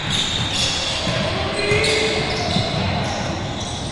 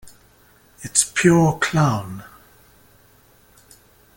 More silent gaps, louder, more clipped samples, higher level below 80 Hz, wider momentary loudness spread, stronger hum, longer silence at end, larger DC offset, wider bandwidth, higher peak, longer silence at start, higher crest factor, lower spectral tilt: neither; about the same, -20 LUFS vs -18 LUFS; neither; first, -38 dBFS vs -52 dBFS; second, 7 LU vs 21 LU; neither; second, 0 s vs 1.95 s; neither; second, 11.5 kHz vs 17 kHz; about the same, -4 dBFS vs -2 dBFS; about the same, 0 s vs 0.05 s; second, 16 dB vs 22 dB; about the same, -3.5 dB/octave vs -4.5 dB/octave